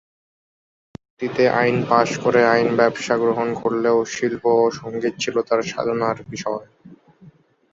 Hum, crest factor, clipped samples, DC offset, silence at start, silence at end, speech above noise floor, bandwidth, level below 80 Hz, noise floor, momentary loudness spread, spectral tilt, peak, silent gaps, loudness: none; 18 dB; under 0.1%; under 0.1%; 1.2 s; 0.45 s; 30 dB; 7.8 kHz; -60 dBFS; -50 dBFS; 10 LU; -5 dB/octave; -2 dBFS; none; -20 LUFS